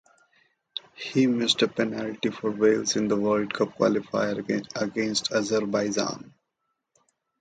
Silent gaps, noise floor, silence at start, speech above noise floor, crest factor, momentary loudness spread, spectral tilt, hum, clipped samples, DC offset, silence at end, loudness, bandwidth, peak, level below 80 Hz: none; -79 dBFS; 0.75 s; 54 dB; 20 dB; 8 LU; -4 dB/octave; none; under 0.1%; under 0.1%; 1.1 s; -25 LUFS; 9.4 kHz; -6 dBFS; -66 dBFS